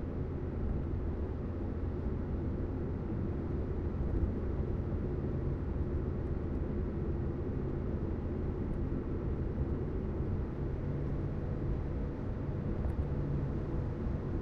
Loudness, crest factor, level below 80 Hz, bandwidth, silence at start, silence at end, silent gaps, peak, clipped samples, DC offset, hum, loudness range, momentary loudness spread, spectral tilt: -37 LUFS; 14 dB; -40 dBFS; 5 kHz; 0 s; 0 s; none; -20 dBFS; under 0.1%; under 0.1%; none; 1 LU; 2 LU; -11 dB/octave